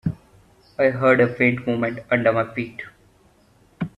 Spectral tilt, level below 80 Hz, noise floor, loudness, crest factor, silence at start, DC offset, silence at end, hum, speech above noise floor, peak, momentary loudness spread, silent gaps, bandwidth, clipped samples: -8.5 dB/octave; -54 dBFS; -56 dBFS; -20 LUFS; 20 dB; 0.05 s; under 0.1%; 0.1 s; none; 36 dB; -2 dBFS; 21 LU; none; 9.6 kHz; under 0.1%